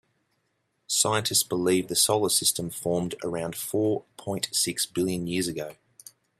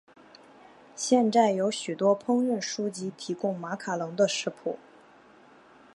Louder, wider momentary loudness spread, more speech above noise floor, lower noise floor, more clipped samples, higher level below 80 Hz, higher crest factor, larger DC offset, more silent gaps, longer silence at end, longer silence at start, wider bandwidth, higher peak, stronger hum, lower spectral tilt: about the same, -25 LUFS vs -27 LUFS; second, 10 LU vs 13 LU; first, 48 dB vs 28 dB; first, -74 dBFS vs -55 dBFS; neither; first, -64 dBFS vs -80 dBFS; about the same, 20 dB vs 20 dB; neither; neither; second, 0.65 s vs 1.2 s; about the same, 0.9 s vs 0.95 s; first, 16 kHz vs 11.5 kHz; about the same, -8 dBFS vs -8 dBFS; neither; second, -3 dB/octave vs -4.5 dB/octave